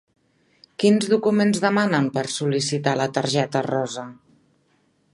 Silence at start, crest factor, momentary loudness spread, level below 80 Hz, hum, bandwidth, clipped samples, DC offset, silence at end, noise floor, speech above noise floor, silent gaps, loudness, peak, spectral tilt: 0.8 s; 18 dB; 9 LU; -66 dBFS; none; 11.5 kHz; under 0.1%; under 0.1%; 1 s; -64 dBFS; 43 dB; none; -21 LUFS; -4 dBFS; -5 dB/octave